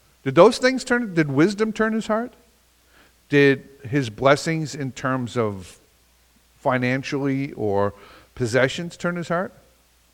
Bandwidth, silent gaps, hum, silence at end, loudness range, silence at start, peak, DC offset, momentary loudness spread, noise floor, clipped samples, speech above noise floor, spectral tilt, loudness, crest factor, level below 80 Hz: 16 kHz; none; none; 0.65 s; 5 LU; 0.25 s; 0 dBFS; under 0.1%; 10 LU; -58 dBFS; under 0.1%; 37 dB; -6 dB/octave; -21 LUFS; 22 dB; -56 dBFS